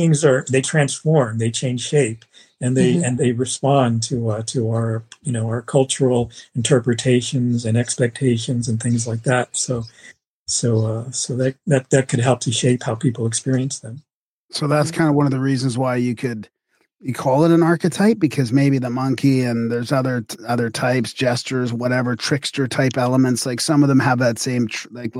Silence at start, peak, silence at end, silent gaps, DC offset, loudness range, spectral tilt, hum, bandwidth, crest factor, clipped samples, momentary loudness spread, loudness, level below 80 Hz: 0 s; -4 dBFS; 0 s; 10.27-10.46 s, 14.14-14.49 s; under 0.1%; 3 LU; -5.5 dB/octave; none; 15 kHz; 16 dB; under 0.1%; 7 LU; -19 LUFS; -58 dBFS